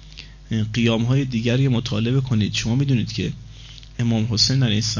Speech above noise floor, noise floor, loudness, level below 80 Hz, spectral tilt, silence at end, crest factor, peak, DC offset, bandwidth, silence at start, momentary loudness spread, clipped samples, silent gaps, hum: 21 dB; -40 dBFS; -21 LUFS; -42 dBFS; -5.5 dB/octave; 0 s; 16 dB; -6 dBFS; under 0.1%; 7.4 kHz; 0 s; 19 LU; under 0.1%; none; none